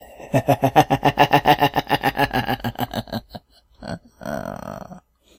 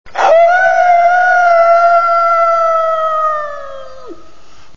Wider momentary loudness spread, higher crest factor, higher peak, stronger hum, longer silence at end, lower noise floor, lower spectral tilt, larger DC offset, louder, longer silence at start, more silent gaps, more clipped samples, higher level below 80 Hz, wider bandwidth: first, 18 LU vs 13 LU; first, 22 dB vs 10 dB; about the same, 0 dBFS vs 0 dBFS; neither; second, 0.4 s vs 0.6 s; about the same, -45 dBFS vs -44 dBFS; first, -5.5 dB/octave vs -2.5 dB/octave; second, under 0.1% vs 4%; second, -20 LUFS vs -10 LUFS; about the same, 0 s vs 0.05 s; neither; neither; first, -44 dBFS vs -52 dBFS; first, 17 kHz vs 7.2 kHz